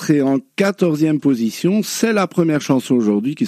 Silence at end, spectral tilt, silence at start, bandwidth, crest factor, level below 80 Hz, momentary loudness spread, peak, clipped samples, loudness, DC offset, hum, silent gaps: 0 s; -6 dB/octave; 0 s; 15.5 kHz; 14 dB; -66 dBFS; 2 LU; -2 dBFS; under 0.1%; -17 LUFS; under 0.1%; none; none